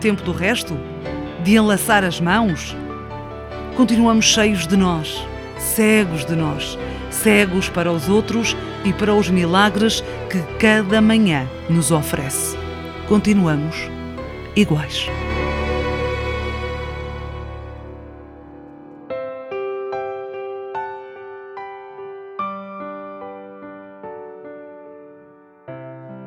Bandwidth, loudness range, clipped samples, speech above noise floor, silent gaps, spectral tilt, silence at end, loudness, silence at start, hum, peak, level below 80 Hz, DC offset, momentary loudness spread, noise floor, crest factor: 17.5 kHz; 15 LU; under 0.1%; 30 dB; none; -4.5 dB/octave; 0 s; -19 LUFS; 0 s; none; 0 dBFS; -36 dBFS; under 0.1%; 21 LU; -47 dBFS; 20 dB